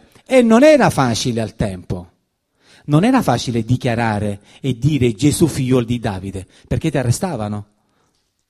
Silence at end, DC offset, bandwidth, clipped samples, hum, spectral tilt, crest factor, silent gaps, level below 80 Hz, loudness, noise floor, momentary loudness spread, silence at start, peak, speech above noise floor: 0.85 s; under 0.1%; 15 kHz; under 0.1%; none; -6 dB/octave; 16 dB; none; -40 dBFS; -16 LUFS; -66 dBFS; 16 LU; 0.3 s; 0 dBFS; 50 dB